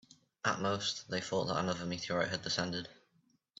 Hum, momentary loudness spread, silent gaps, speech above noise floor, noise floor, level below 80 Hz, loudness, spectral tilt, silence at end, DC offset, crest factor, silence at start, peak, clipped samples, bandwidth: none; 5 LU; none; 38 dB; -74 dBFS; -72 dBFS; -36 LUFS; -4 dB/octave; 0.65 s; under 0.1%; 20 dB; 0.45 s; -16 dBFS; under 0.1%; 8 kHz